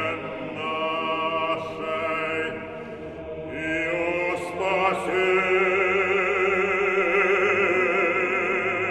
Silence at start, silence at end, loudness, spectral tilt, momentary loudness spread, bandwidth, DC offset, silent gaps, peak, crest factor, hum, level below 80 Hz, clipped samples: 0 s; 0 s; -23 LUFS; -5 dB/octave; 12 LU; 10.5 kHz; under 0.1%; none; -8 dBFS; 16 dB; none; -56 dBFS; under 0.1%